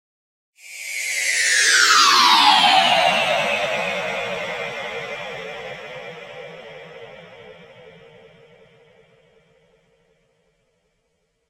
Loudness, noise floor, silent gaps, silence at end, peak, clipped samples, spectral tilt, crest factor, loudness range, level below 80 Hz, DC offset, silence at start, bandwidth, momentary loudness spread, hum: -16 LUFS; -70 dBFS; none; 3.6 s; -2 dBFS; under 0.1%; 0 dB/octave; 20 dB; 22 LU; -64 dBFS; under 0.1%; 0.65 s; 16 kHz; 25 LU; none